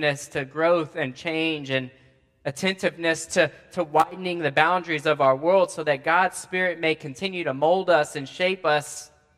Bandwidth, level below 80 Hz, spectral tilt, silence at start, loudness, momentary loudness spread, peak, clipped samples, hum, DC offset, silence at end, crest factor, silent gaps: 14.5 kHz; -66 dBFS; -4 dB/octave; 0 s; -23 LUFS; 9 LU; -2 dBFS; under 0.1%; none; under 0.1%; 0.3 s; 22 dB; none